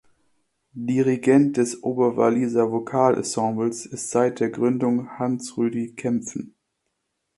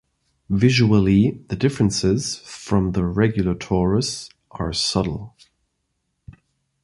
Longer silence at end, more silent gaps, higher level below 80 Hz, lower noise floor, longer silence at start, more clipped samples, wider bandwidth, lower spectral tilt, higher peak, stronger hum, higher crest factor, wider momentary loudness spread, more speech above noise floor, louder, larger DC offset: first, 0.9 s vs 0.5 s; neither; second, -66 dBFS vs -40 dBFS; about the same, -77 dBFS vs -74 dBFS; first, 0.75 s vs 0.5 s; neither; about the same, 11.5 kHz vs 11.5 kHz; about the same, -6 dB/octave vs -5.5 dB/octave; about the same, -4 dBFS vs -2 dBFS; neither; about the same, 20 dB vs 18 dB; second, 9 LU vs 12 LU; about the same, 55 dB vs 54 dB; about the same, -22 LUFS vs -20 LUFS; neither